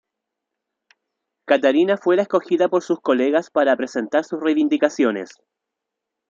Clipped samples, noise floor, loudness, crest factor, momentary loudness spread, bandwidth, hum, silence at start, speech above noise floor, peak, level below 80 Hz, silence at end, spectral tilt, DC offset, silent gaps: under 0.1%; -82 dBFS; -19 LUFS; 18 dB; 5 LU; 7.6 kHz; none; 1.5 s; 64 dB; -2 dBFS; -74 dBFS; 1.05 s; -5 dB/octave; under 0.1%; none